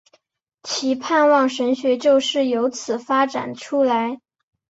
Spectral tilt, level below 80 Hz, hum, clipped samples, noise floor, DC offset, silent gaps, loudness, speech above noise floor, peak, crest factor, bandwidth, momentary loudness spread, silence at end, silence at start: -3 dB/octave; -68 dBFS; none; under 0.1%; -63 dBFS; under 0.1%; none; -20 LUFS; 44 dB; -4 dBFS; 16 dB; 8 kHz; 11 LU; 0.6 s; 0.65 s